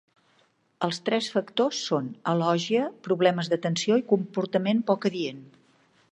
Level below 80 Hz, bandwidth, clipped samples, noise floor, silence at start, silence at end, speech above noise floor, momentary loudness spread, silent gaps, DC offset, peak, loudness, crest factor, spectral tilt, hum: -76 dBFS; 10.5 kHz; under 0.1%; -66 dBFS; 0.8 s; 0.65 s; 40 dB; 6 LU; none; under 0.1%; -6 dBFS; -26 LUFS; 20 dB; -5.5 dB/octave; none